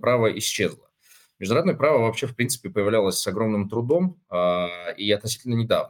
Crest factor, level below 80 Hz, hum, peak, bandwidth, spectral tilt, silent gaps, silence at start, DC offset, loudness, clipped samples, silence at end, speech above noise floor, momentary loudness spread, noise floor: 18 dB; -62 dBFS; none; -6 dBFS; 18 kHz; -4.5 dB/octave; none; 0.05 s; under 0.1%; -23 LUFS; under 0.1%; 0 s; 34 dB; 6 LU; -57 dBFS